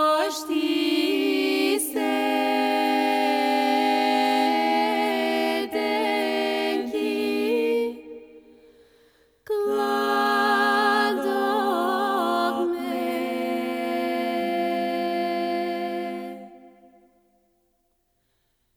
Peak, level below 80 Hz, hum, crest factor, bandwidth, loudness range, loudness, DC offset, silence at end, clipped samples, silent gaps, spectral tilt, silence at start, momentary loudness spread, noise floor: -10 dBFS; -68 dBFS; none; 14 dB; over 20 kHz; 6 LU; -23 LUFS; under 0.1%; 2.1 s; under 0.1%; none; -3 dB/octave; 0 s; 6 LU; -71 dBFS